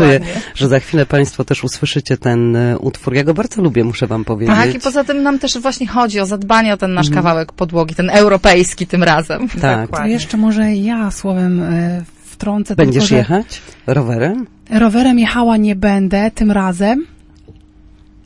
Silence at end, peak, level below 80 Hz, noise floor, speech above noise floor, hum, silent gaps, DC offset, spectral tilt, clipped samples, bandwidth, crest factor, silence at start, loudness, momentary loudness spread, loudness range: 0.75 s; 0 dBFS; -34 dBFS; -43 dBFS; 29 dB; none; none; under 0.1%; -6 dB/octave; under 0.1%; 11.5 kHz; 14 dB; 0 s; -14 LUFS; 7 LU; 3 LU